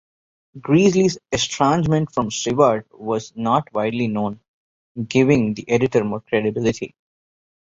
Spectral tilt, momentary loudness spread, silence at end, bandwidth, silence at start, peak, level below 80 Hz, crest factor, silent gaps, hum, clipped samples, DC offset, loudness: -5.5 dB/octave; 10 LU; 0.8 s; 7.8 kHz; 0.55 s; -2 dBFS; -50 dBFS; 18 dB; 4.48-4.95 s; none; under 0.1%; under 0.1%; -20 LUFS